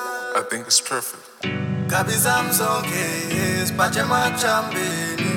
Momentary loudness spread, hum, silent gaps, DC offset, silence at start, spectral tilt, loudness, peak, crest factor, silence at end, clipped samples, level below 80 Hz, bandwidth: 8 LU; none; none; under 0.1%; 0 s; -3 dB/octave; -21 LUFS; -2 dBFS; 18 dB; 0 s; under 0.1%; -60 dBFS; 19.5 kHz